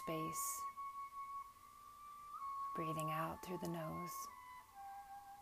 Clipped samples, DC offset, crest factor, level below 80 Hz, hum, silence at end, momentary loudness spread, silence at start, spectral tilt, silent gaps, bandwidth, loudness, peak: under 0.1%; under 0.1%; 20 dB; -74 dBFS; none; 0 s; 15 LU; 0 s; -4.5 dB/octave; none; 15.5 kHz; -46 LUFS; -26 dBFS